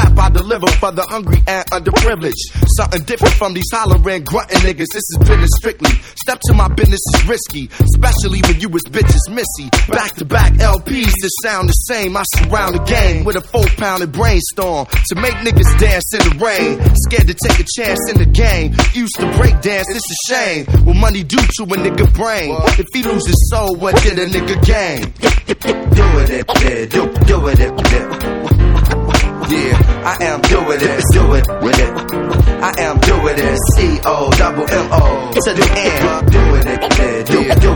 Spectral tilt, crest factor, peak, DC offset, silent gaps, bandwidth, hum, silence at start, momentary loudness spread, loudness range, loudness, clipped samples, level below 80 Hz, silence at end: -5 dB/octave; 12 dB; 0 dBFS; under 0.1%; none; 19.5 kHz; none; 0 s; 5 LU; 2 LU; -13 LUFS; 0.2%; -14 dBFS; 0 s